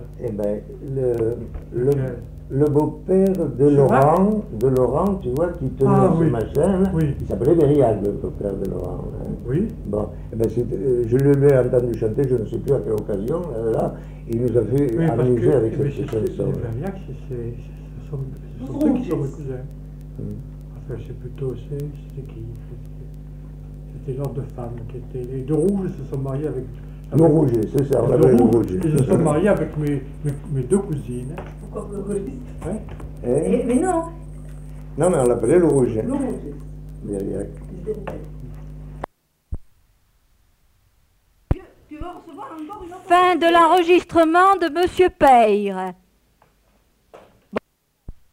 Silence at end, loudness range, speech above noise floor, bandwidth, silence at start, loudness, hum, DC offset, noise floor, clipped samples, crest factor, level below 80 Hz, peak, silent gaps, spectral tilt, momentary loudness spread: 0.15 s; 15 LU; 41 dB; 16 kHz; 0 s; -20 LUFS; none; under 0.1%; -60 dBFS; under 0.1%; 16 dB; -38 dBFS; -4 dBFS; none; -7.5 dB/octave; 20 LU